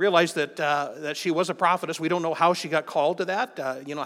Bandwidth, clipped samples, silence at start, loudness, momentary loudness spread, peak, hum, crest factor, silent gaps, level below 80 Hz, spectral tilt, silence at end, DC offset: 16 kHz; under 0.1%; 0 s; -25 LUFS; 7 LU; -6 dBFS; none; 20 dB; none; -88 dBFS; -4.5 dB/octave; 0 s; under 0.1%